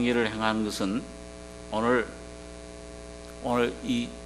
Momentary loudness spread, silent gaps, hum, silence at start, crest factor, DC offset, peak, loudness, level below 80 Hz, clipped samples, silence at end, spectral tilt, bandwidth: 17 LU; none; 60 Hz at -45 dBFS; 0 s; 22 dB; under 0.1%; -8 dBFS; -28 LUFS; -48 dBFS; under 0.1%; 0 s; -5 dB/octave; 13 kHz